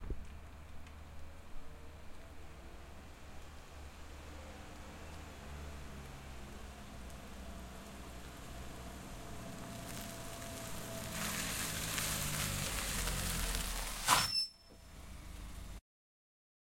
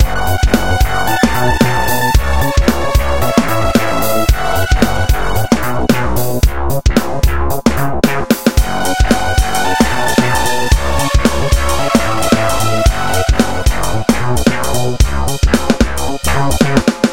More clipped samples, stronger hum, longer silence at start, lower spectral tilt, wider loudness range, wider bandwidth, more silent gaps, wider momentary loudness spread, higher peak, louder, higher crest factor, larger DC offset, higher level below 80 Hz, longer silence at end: second, under 0.1% vs 0.3%; neither; about the same, 0 s vs 0 s; second, -2.5 dB/octave vs -5 dB/octave; first, 18 LU vs 1 LU; about the same, 16.5 kHz vs 17 kHz; neither; first, 18 LU vs 3 LU; second, -14 dBFS vs 0 dBFS; second, -40 LUFS vs -14 LUFS; first, 30 dB vs 14 dB; second, under 0.1% vs 10%; second, -50 dBFS vs -18 dBFS; first, 1 s vs 0 s